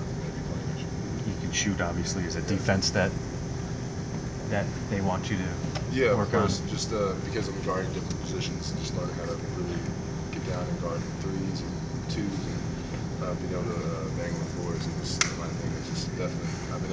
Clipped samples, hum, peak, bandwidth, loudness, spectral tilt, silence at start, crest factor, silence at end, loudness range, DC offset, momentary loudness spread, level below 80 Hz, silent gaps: under 0.1%; none; -8 dBFS; 8 kHz; -30 LUFS; -5 dB/octave; 0 s; 22 dB; 0 s; 4 LU; under 0.1%; 8 LU; -42 dBFS; none